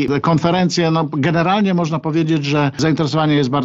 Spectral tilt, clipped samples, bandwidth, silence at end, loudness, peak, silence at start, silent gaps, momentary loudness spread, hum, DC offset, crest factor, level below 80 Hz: -6.5 dB/octave; under 0.1%; 7.8 kHz; 0 s; -16 LUFS; -2 dBFS; 0 s; none; 2 LU; none; under 0.1%; 14 dB; -50 dBFS